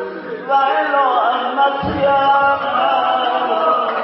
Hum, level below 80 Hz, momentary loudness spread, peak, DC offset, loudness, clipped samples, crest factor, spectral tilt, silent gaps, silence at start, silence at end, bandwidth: none; -48 dBFS; 4 LU; -4 dBFS; under 0.1%; -15 LUFS; under 0.1%; 12 dB; -8.5 dB/octave; none; 0 s; 0 s; 5.8 kHz